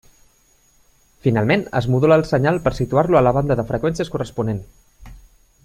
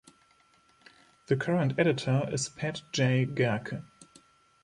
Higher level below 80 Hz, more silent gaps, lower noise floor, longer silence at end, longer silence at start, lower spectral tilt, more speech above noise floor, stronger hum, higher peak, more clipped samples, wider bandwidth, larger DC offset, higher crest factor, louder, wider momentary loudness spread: first, -42 dBFS vs -66 dBFS; neither; second, -57 dBFS vs -64 dBFS; second, 0.45 s vs 0.6 s; about the same, 1.25 s vs 1.3 s; first, -7.5 dB/octave vs -5.5 dB/octave; about the same, 39 dB vs 36 dB; neither; first, -2 dBFS vs -10 dBFS; neither; first, 14.5 kHz vs 11 kHz; neither; about the same, 18 dB vs 20 dB; first, -19 LUFS vs -29 LUFS; about the same, 9 LU vs 9 LU